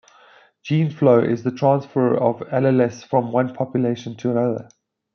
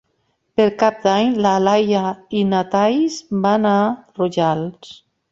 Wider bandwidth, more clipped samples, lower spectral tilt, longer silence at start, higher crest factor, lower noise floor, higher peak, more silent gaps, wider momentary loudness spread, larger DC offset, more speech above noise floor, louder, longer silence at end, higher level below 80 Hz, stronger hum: second, 6.8 kHz vs 7.6 kHz; neither; first, -8.5 dB/octave vs -6 dB/octave; about the same, 0.65 s vs 0.6 s; about the same, 18 dB vs 16 dB; second, -52 dBFS vs -67 dBFS; about the same, -2 dBFS vs -2 dBFS; neither; about the same, 8 LU vs 7 LU; neither; second, 32 dB vs 50 dB; about the same, -20 LUFS vs -18 LUFS; about the same, 0.5 s vs 0.4 s; second, -66 dBFS vs -58 dBFS; neither